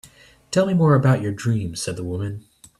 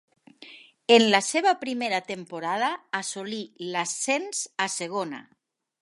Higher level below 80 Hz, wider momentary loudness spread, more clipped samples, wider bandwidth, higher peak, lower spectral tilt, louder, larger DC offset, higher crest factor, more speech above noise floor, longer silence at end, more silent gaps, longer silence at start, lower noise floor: first, -52 dBFS vs -82 dBFS; second, 12 LU vs 16 LU; neither; about the same, 12.5 kHz vs 11.5 kHz; second, -6 dBFS vs -2 dBFS; first, -6.5 dB/octave vs -2.5 dB/octave; first, -21 LUFS vs -25 LUFS; neither; second, 16 dB vs 24 dB; first, 29 dB vs 24 dB; second, 0.4 s vs 0.6 s; neither; second, 0.05 s vs 0.4 s; about the same, -48 dBFS vs -50 dBFS